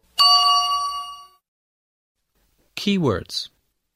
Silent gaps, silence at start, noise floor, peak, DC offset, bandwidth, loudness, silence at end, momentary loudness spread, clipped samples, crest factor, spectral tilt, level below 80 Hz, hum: 1.48-2.15 s; 0.2 s; -66 dBFS; -4 dBFS; under 0.1%; 16 kHz; -18 LUFS; 0.5 s; 22 LU; under 0.1%; 18 dB; -3.5 dB/octave; -56 dBFS; none